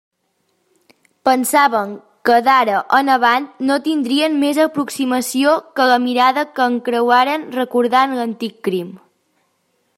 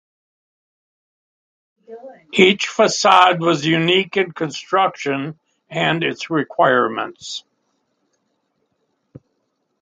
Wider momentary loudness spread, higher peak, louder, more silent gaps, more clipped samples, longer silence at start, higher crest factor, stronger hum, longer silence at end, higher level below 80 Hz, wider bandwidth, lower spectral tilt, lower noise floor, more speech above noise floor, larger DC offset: second, 8 LU vs 18 LU; about the same, -2 dBFS vs 0 dBFS; about the same, -16 LUFS vs -17 LUFS; neither; neither; second, 1.25 s vs 1.9 s; about the same, 16 dB vs 20 dB; neither; second, 1 s vs 2.4 s; about the same, -68 dBFS vs -66 dBFS; first, 16 kHz vs 9.6 kHz; about the same, -3.5 dB/octave vs -4 dB/octave; about the same, -67 dBFS vs -70 dBFS; about the same, 51 dB vs 53 dB; neither